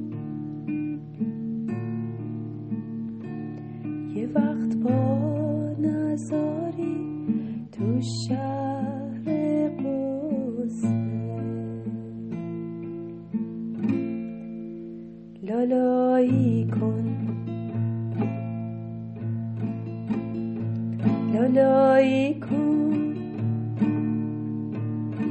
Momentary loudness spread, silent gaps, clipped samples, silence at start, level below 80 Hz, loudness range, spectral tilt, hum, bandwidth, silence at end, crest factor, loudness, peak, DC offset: 13 LU; none; under 0.1%; 0 s; -64 dBFS; 9 LU; -8.5 dB/octave; none; 8.4 kHz; 0 s; 20 dB; -27 LUFS; -6 dBFS; under 0.1%